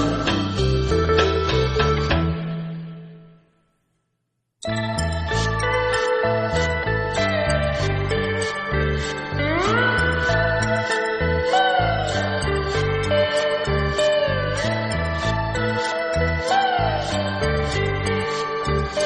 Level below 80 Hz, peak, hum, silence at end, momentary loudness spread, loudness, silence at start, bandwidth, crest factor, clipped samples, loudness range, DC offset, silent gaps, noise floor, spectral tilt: -34 dBFS; -4 dBFS; none; 0 s; 5 LU; -21 LUFS; 0 s; 10 kHz; 18 dB; under 0.1%; 5 LU; under 0.1%; none; -75 dBFS; -5 dB/octave